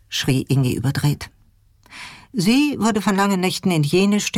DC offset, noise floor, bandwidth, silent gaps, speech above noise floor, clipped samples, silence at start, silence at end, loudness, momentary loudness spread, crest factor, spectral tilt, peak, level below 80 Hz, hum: under 0.1%; -55 dBFS; 16.5 kHz; none; 37 dB; under 0.1%; 0.1 s; 0 s; -19 LUFS; 16 LU; 12 dB; -5 dB/octave; -8 dBFS; -48 dBFS; none